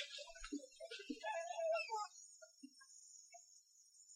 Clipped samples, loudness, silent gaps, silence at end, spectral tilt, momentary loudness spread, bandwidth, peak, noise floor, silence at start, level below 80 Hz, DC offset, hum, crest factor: under 0.1%; -46 LUFS; none; 0 s; -1 dB/octave; 21 LU; 13.5 kHz; -32 dBFS; -69 dBFS; 0 s; -72 dBFS; under 0.1%; none; 18 dB